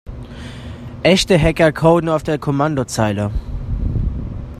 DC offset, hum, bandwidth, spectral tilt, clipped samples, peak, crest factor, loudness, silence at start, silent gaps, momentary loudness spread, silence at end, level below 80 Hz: under 0.1%; none; 14.5 kHz; -5.5 dB/octave; under 0.1%; 0 dBFS; 18 dB; -17 LUFS; 0.05 s; none; 19 LU; 0 s; -28 dBFS